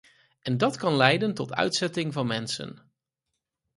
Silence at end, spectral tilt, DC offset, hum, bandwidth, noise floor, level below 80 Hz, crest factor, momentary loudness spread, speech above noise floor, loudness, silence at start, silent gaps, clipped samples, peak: 1 s; -4.5 dB/octave; under 0.1%; none; 11.5 kHz; -84 dBFS; -66 dBFS; 26 dB; 12 LU; 58 dB; -26 LUFS; 0.45 s; none; under 0.1%; -2 dBFS